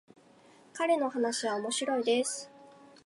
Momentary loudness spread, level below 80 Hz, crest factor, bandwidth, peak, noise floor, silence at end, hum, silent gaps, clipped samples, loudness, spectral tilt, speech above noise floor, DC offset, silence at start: 12 LU; -86 dBFS; 16 dB; 11.5 kHz; -16 dBFS; -59 dBFS; 0.2 s; none; none; under 0.1%; -31 LUFS; -2 dB/octave; 29 dB; under 0.1%; 0.75 s